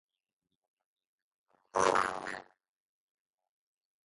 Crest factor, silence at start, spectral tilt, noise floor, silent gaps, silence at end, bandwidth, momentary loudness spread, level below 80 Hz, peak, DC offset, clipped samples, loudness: 26 dB; 1.75 s; -2.5 dB/octave; -88 dBFS; none; 1.65 s; 11.5 kHz; 14 LU; -72 dBFS; -12 dBFS; under 0.1%; under 0.1%; -32 LUFS